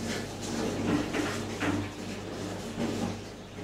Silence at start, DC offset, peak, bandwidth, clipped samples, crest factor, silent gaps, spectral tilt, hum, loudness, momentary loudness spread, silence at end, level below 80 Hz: 0 s; under 0.1%; -16 dBFS; 16 kHz; under 0.1%; 16 dB; none; -5 dB/octave; none; -33 LUFS; 8 LU; 0 s; -52 dBFS